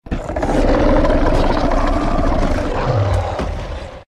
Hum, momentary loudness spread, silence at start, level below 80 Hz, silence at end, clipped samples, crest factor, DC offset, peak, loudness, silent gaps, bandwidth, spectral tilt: none; 10 LU; 0.05 s; -20 dBFS; 0.1 s; under 0.1%; 14 dB; under 0.1%; -2 dBFS; -18 LUFS; none; 9.8 kHz; -7 dB/octave